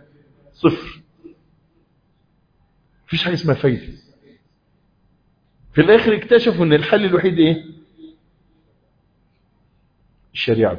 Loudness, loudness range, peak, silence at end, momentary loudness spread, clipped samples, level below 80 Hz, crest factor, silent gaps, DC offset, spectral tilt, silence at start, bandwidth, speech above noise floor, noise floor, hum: -17 LUFS; 9 LU; 0 dBFS; 0 s; 14 LU; under 0.1%; -50 dBFS; 20 dB; none; under 0.1%; -8 dB/octave; 0.65 s; 5.2 kHz; 45 dB; -61 dBFS; none